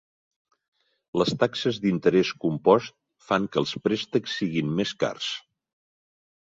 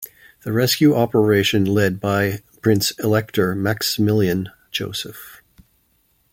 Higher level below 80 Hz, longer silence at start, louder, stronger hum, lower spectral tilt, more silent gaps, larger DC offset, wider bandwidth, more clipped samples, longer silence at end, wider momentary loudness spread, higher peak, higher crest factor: second, -62 dBFS vs -54 dBFS; first, 1.15 s vs 0 s; second, -25 LUFS vs -19 LUFS; neither; about the same, -5.5 dB/octave vs -5 dB/octave; neither; neither; second, 7.8 kHz vs 17 kHz; neither; first, 1.1 s vs 0.95 s; second, 9 LU vs 12 LU; about the same, -4 dBFS vs -2 dBFS; about the same, 22 dB vs 18 dB